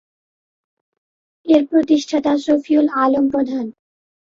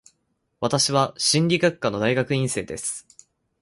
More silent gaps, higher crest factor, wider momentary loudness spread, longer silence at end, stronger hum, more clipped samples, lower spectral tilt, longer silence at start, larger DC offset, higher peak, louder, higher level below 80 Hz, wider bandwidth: neither; about the same, 16 dB vs 20 dB; about the same, 10 LU vs 10 LU; about the same, 0.6 s vs 0.6 s; neither; neither; about the same, -5 dB/octave vs -4 dB/octave; first, 1.45 s vs 0.6 s; neither; about the same, -2 dBFS vs -4 dBFS; first, -17 LUFS vs -22 LUFS; about the same, -60 dBFS vs -58 dBFS; second, 7.6 kHz vs 11.5 kHz